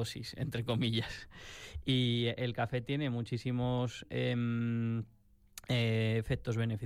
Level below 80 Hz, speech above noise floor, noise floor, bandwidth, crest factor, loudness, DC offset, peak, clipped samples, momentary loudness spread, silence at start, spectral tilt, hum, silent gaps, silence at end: -56 dBFS; 22 dB; -56 dBFS; 14.5 kHz; 14 dB; -34 LUFS; under 0.1%; -20 dBFS; under 0.1%; 14 LU; 0 s; -6.5 dB/octave; none; none; 0 s